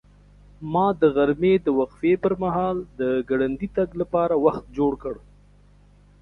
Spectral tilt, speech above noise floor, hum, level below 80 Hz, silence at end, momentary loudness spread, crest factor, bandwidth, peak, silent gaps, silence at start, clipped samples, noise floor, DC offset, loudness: -9.5 dB/octave; 31 dB; 50 Hz at -50 dBFS; -48 dBFS; 1.05 s; 7 LU; 18 dB; 5.6 kHz; -4 dBFS; none; 0.6 s; under 0.1%; -53 dBFS; under 0.1%; -23 LUFS